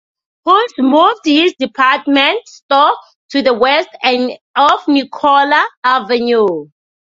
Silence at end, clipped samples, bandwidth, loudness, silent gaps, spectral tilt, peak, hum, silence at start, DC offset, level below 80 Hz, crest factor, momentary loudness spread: 0.35 s; under 0.1%; 7.6 kHz; -12 LUFS; 2.62-2.69 s, 3.15-3.29 s, 4.41-4.54 s, 5.77-5.82 s; -4 dB/octave; 0 dBFS; none; 0.45 s; under 0.1%; -60 dBFS; 12 dB; 7 LU